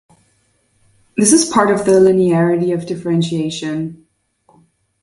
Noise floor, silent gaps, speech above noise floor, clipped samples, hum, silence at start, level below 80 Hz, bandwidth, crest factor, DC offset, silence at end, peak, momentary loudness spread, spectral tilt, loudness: -60 dBFS; none; 46 dB; under 0.1%; none; 1.15 s; -54 dBFS; 11.5 kHz; 16 dB; under 0.1%; 1.05 s; 0 dBFS; 12 LU; -5 dB/octave; -14 LUFS